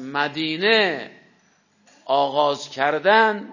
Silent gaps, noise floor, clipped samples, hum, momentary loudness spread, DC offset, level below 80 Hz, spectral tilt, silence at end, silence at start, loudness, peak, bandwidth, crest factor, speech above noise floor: none; -61 dBFS; under 0.1%; none; 8 LU; under 0.1%; -76 dBFS; -4 dB/octave; 0 s; 0 s; -20 LUFS; -4 dBFS; 7.4 kHz; 18 dB; 41 dB